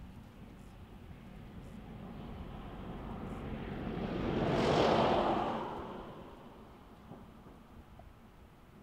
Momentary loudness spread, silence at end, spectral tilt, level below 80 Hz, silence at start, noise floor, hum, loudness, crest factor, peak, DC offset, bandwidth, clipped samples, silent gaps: 26 LU; 0 s; -6.5 dB/octave; -52 dBFS; 0 s; -57 dBFS; none; -35 LUFS; 22 dB; -16 dBFS; under 0.1%; 16 kHz; under 0.1%; none